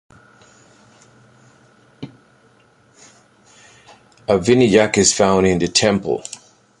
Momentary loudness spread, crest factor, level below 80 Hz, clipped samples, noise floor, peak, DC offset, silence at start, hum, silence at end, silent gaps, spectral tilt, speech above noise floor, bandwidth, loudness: 25 LU; 20 dB; -48 dBFS; under 0.1%; -54 dBFS; 0 dBFS; under 0.1%; 2 s; none; 0.45 s; none; -4 dB/octave; 39 dB; 11.5 kHz; -15 LUFS